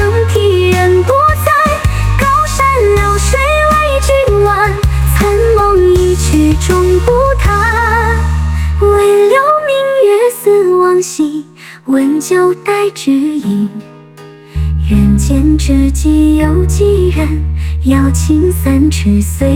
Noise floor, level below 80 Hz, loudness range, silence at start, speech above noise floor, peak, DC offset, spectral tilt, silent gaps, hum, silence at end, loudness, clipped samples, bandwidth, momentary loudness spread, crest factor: -34 dBFS; -16 dBFS; 3 LU; 0 s; 24 dB; 0 dBFS; under 0.1%; -6 dB/octave; none; none; 0 s; -10 LUFS; under 0.1%; 16.5 kHz; 6 LU; 10 dB